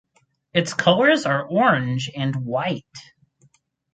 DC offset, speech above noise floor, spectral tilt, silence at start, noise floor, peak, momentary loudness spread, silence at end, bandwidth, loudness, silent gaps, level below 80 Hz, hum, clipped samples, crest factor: under 0.1%; 44 dB; -5.5 dB/octave; 0.55 s; -65 dBFS; -2 dBFS; 9 LU; 0.95 s; 9.4 kHz; -20 LUFS; none; -62 dBFS; none; under 0.1%; 20 dB